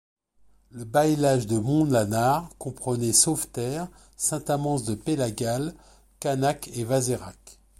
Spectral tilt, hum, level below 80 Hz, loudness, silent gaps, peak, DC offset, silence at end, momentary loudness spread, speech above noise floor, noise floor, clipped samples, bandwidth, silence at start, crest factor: -4.5 dB/octave; none; -54 dBFS; -25 LUFS; none; -4 dBFS; under 0.1%; 0.25 s; 12 LU; 35 dB; -60 dBFS; under 0.1%; 16.5 kHz; 0.75 s; 22 dB